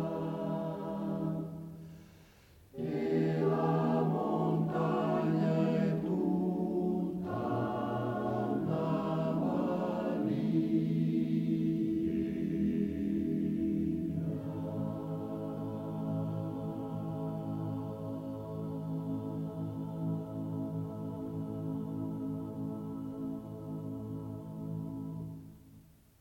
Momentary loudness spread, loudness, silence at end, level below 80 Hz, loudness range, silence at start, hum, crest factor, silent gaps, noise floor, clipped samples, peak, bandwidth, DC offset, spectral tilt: 10 LU; -35 LUFS; 0.4 s; -62 dBFS; 8 LU; 0 s; none; 16 dB; none; -59 dBFS; under 0.1%; -18 dBFS; 15 kHz; under 0.1%; -9.5 dB/octave